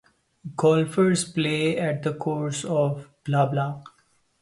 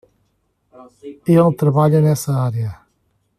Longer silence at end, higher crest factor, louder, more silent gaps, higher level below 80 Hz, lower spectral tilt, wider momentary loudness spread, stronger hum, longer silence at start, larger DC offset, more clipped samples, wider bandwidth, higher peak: about the same, 0.55 s vs 0.65 s; about the same, 18 dB vs 16 dB; second, -24 LUFS vs -16 LUFS; neither; second, -64 dBFS vs -54 dBFS; second, -5.5 dB/octave vs -8 dB/octave; second, 12 LU vs 15 LU; neither; second, 0.45 s vs 0.8 s; neither; neither; second, 11.5 kHz vs 14.5 kHz; second, -6 dBFS vs -2 dBFS